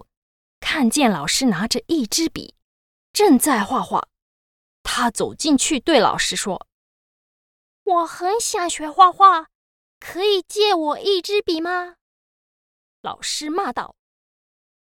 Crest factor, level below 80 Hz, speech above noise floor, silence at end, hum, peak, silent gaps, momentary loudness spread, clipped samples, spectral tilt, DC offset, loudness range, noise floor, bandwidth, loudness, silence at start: 20 dB; -52 dBFS; over 71 dB; 1.05 s; none; 0 dBFS; 2.64-3.14 s, 4.22-4.85 s, 6.72-7.86 s, 9.55-10.01 s, 12.01-13.04 s; 16 LU; under 0.1%; -2.5 dB/octave; under 0.1%; 6 LU; under -90 dBFS; 18 kHz; -19 LUFS; 0.6 s